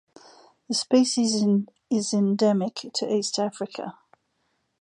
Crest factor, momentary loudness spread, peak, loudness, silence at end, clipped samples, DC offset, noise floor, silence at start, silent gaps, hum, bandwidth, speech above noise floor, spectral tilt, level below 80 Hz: 18 dB; 11 LU; -8 dBFS; -24 LUFS; 0.9 s; under 0.1%; under 0.1%; -73 dBFS; 0.7 s; none; none; 11 kHz; 49 dB; -5 dB/octave; -74 dBFS